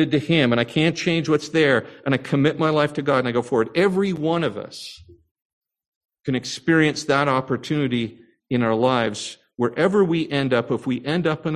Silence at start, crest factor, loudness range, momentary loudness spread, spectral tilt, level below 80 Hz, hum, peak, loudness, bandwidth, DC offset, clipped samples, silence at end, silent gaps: 0 s; 18 dB; 4 LU; 8 LU; -6 dB/octave; -58 dBFS; none; -2 dBFS; -21 LUFS; 12 kHz; under 0.1%; under 0.1%; 0 s; 5.31-5.35 s, 5.45-5.61 s, 5.87-6.01 s